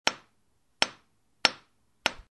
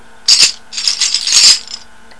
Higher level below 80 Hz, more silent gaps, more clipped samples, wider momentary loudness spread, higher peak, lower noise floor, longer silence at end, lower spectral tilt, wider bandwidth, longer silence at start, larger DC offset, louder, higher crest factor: second, -64 dBFS vs -52 dBFS; neither; second, under 0.1% vs 0.9%; first, 17 LU vs 10 LU; about the same, -2 dBFS vs 0 dBFS; first, -74 dBFS vs -33 dBFS; second, 0.15 s vs 0.4 s; first, 0 dB/octave vs 3.5 dB/octave; about the same, 12 kHz vs 11 kHz; second, 0.05 s vs 0.3 s; second, under 0.1% vs 2%; second, -29 LUFS vs -8 LUFS; first, 32 dB vs 12 dB